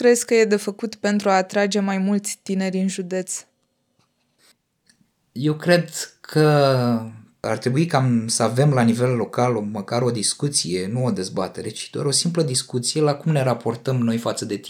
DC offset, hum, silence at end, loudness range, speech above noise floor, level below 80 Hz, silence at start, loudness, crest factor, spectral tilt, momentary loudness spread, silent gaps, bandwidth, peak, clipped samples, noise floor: under 0.1%; none; 0 s; 6 LU; 49 dB; -70 dBFS; 0 s; -21 LUFS; 18 dB; -5 dB/octave; 9 LU; none; 18 kHz; -2 dBFS; under 0.1%; -69 dBFS